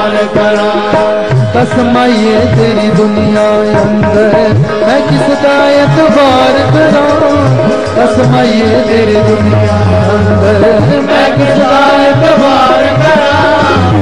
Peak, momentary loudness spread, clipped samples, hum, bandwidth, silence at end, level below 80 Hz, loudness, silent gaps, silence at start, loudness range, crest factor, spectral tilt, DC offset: 0 dBFS; 3 LU; 0.1%; none; 11.5 kHz; 0 s; -34 dBFS; -7 LUFS; none; 0 s; 2 LU; 8 dB; -6.5 dB/octave; 3%